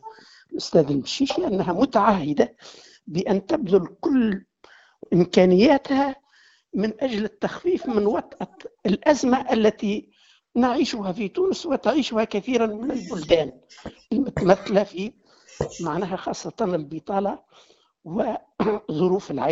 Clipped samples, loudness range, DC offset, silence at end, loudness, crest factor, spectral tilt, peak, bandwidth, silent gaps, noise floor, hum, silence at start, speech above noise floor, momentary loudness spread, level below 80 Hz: under 0.1%; 5 LU; under 0.1%; 0 s; -23 LUFS; 22 dB; -5.5 dB/octave; -2 dBFS; 8 kHz; none; -58 dBFS; none; 0.05 s; 36 dB; 12 LU; -54 dBFS